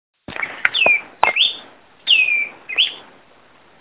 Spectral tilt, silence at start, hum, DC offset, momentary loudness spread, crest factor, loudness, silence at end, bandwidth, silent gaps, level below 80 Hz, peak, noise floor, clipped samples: -4 dB/octave; 0.3 s; none; 0.2%; 15 LU; 20 dB; -16 LUFS; 0.8 s; 4 kHz; none; -60 dBFS; 0 dBFS; -51 dBFS; under 0.1%